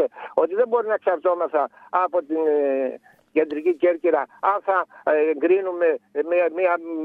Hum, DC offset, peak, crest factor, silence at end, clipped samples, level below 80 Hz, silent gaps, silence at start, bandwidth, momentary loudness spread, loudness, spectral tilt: none; under 0.1%; -4 dBFS; 16 dB; 0 s; under 0.1%; -78 dBFS; none; 0 s; 4.4 kHz; 4 LU; -22 LUFS; -7 dB/octave